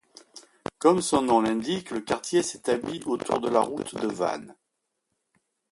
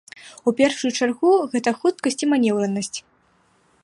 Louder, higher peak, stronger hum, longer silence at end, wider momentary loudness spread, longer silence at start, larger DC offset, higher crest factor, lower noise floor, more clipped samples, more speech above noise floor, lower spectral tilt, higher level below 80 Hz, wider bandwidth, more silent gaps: second, -26 LUFS vs -21 LUFS; about the same, -6 dBFS vs -4 dBFS; neither; first, 1.2 s vs 0.85 s; about the same, 9 LU vs 9 LU; about the same, 0.35 s vs 0.25 s; neither; about the same, 22 dB vs 18 dB; first, -80 dBFS vs -61 dBFS; neither; first, 55 dB vs 41 dB; about the same, -4.5 dB/octave vs -4 dB/octave; first, -62 dBFS vs -68 dBFS; about the same, 11.5 kHz vs 11.5 kHz; neither